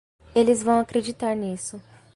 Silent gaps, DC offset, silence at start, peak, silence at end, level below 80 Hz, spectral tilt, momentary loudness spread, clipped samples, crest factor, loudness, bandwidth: none; under 0.1%; 0.35 s; -8 dBFS; 0.35 s; -56 dBFS; -5 dB/octave; 12 LU; under 0.1%; 16 dB; -23 LUFS; 11.5 kHz